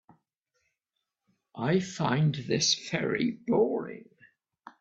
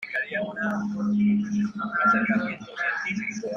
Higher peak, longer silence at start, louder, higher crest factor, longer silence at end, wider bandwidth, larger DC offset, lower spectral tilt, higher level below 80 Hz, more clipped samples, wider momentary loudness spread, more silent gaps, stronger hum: about the same, -12 dBFS vs -10 dBFS; first, 1.55 s vs 0 s; second, -28 LUFS vs -25 LUFS; about the same, 18 dB vs 14 dB; about the same, 0.1 s vs 0 s; first, 8 kHz vs 7 kHz; neither; second, -4.5 dB/octave vs -6.5 dB/octave; about the same, -68 dBFS vs -64 dBFS; neither; first, 12 LU vs 7 LU; neither; neither